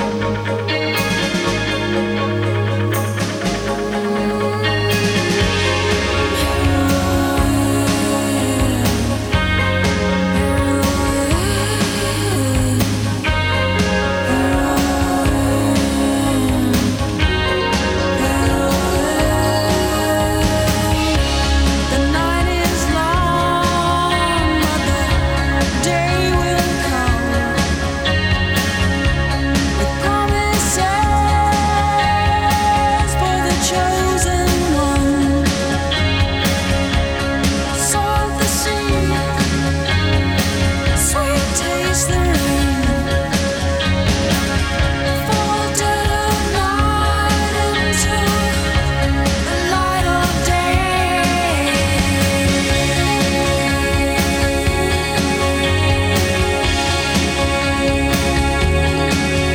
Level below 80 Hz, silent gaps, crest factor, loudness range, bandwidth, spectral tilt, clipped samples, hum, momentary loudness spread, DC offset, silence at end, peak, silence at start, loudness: -24 dBFS; none; 14 dB; 2 LU; 18 kHz; -4.5 dB/octave; under 0.1%; none; 2 LU; under 0.1%; 0 s; -2 dBFS; 0 s; -16 LUFS